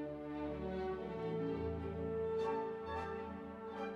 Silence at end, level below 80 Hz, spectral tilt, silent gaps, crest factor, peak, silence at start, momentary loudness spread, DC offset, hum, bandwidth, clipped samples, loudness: 0 s; -60 dBFS; -8 dB/octave; none; 14 dB; -28 dBFS; 0 s; 7 LU; under 0.1%; none; 8 kHz; under 0.1%; -42 LUFS